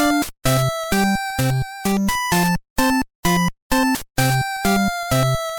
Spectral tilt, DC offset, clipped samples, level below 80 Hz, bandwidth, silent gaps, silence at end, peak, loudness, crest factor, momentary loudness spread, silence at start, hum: -4.5 dB/octave; under 0.1%; under 0.1%; -36 dBFS; 19 kHz; 2.70-2.76 s, 3.15-3.23 s, 3.62-3.70 s; 0 s; -4 dBFS; -20 LUFS; 16 dB; 2 LU; 0 s; none